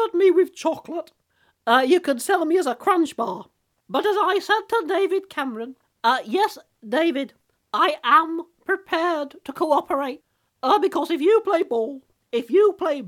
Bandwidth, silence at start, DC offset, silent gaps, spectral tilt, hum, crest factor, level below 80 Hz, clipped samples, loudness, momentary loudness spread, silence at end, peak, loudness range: 16.5 kHz; 0 s; under 0.1%; none; -3.5 dB/octave; none; 18 dB; -72 dBFS; under 0.1%; -22 LUFS; 13 LU; 0 s; -4 dBFS; 2 LU